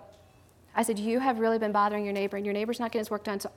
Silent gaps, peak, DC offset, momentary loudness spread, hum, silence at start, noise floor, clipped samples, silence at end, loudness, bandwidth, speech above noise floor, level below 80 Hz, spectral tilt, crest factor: none; -10 dBFS; under 0.1%; 6 LU; none; 0 s; -58 dBFS; under 0.1%; 0.05 s; -29 LUFS; 18 kHz; 29 dB; -70 dBFS; -5 dB/octave; 18 dB